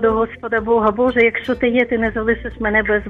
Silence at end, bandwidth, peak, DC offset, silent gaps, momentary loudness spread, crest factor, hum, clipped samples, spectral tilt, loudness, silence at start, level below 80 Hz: 0 s; 5.2 kHz; -2 dBFS; under 0.1%; none; 6 LU; 14 dB; none; under 0.1%; -7.5 dB/octave; -17 LUFS; 0 s; -36 dBFS